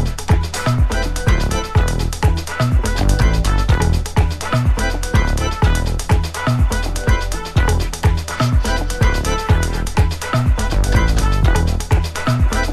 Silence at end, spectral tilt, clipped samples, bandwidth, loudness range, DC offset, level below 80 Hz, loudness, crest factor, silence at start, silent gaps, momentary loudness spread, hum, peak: 0 s; -5.5 dB/octave; under 0.1%; 14 kHz; 1 LU; under 0.1%; -18 dBFS; -18 LUFS; 14 dB; 0 s; none; 3 LU; none; -2 dBFS